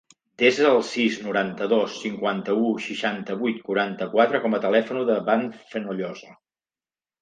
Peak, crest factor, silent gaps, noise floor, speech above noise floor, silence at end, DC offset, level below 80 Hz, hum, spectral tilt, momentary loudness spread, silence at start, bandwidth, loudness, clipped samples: -4 dBFS; 20 dB; none; under -90 dBFS; over 67 dB; 0.9 s; under 0.1%; -74 dBFS; none; -5 dB/octave; 11 LU; 0.4 s; 9.4 kHz; -23 LUFS; under 0.1%